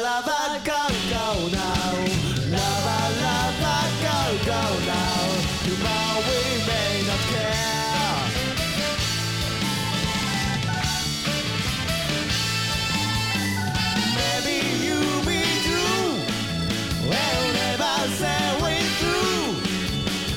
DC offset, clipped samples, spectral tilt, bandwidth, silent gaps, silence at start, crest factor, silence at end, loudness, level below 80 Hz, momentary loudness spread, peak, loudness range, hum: under 0.1%; under 0.1%; -3.5 dB/octave; 18.5 kHz; none; 0 s; 14 dB; 0 s; -23 LUFS; -40 dBFS; 3 LU; -8 dBFS; 1 LU; none